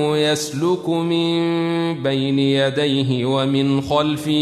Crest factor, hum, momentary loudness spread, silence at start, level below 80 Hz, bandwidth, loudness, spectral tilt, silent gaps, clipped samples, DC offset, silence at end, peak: 14 dB; none; 3 LU; 0 s; -54 dBFS; 13.5 kHz; -19 LUFS; -5.5 dB/octave; none; under 0.1%; under 0.1%; 0 s; -4 dBFS